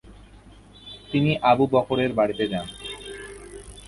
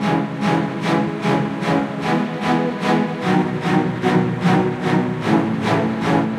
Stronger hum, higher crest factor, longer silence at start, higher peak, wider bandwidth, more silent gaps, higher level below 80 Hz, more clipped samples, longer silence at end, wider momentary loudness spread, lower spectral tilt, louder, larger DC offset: first, 50 Hz at -45 dBFS vs none; about the same, 20 dB vs 16 dB; about the same, 0.05 s vs 0 s; second, -6 dBFS vs -2 dBFS; about the same, 11.5 kHz vs 12.5 kHz; neither; about the same, -50 dBFS vs -54 dBFS; neither; about the same, 0 s vs 0 s; first, 22 LU vs 2 LU; about the same, -6.5 dB/octave vs -7 dB/octave; second, -23 LUFS vs -19 LUFS; neither